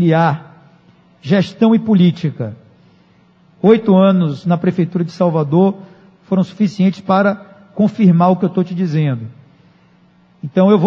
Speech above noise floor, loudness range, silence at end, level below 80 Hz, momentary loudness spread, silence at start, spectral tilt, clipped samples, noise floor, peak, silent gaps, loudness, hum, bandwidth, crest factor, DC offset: 37 dB; 2 LU; 0 s; -62 dBFS; 15 LU; 0 s; -9 dB/octave; under 0.1%; -50 dBFS; 0 dBFS; none; -14 LUFS; none; 6.6 kHz; 14 dB; under 0.1%